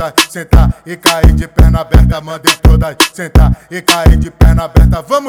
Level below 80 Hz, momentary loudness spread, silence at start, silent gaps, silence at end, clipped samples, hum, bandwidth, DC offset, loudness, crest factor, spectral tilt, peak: -12 dBFS; 4 LU; 0 s; none; 0 s; 3%; none; 18.5 kHz; under 0.1%; -10 LUFS; 8 dB; -5 dB/octave; 0 dBFS